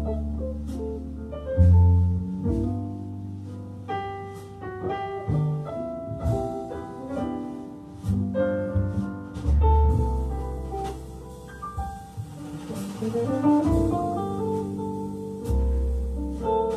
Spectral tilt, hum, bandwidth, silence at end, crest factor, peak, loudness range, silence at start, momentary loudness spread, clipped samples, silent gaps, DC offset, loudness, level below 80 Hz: -9 dB/octave; none; 11.5 kHz; 0 s; 18 dB; -8 dBFS; 7 LU; 0 s; 16 LU; under 0.1%; none; under 0.1%; -27 LUFS; -32 dBFS